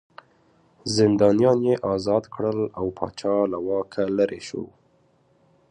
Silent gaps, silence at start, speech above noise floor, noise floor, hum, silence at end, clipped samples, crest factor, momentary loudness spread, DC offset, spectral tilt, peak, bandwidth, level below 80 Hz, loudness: none; 0.85 s; 40 dB; -62 dBFS; none; 1.05 s; under 0.1%; 18 dB; 15 LU; under 0.1%; -6 dB/octave; -6 dBFS; 10.5 kHz; -56 dBFS; -23 LUFS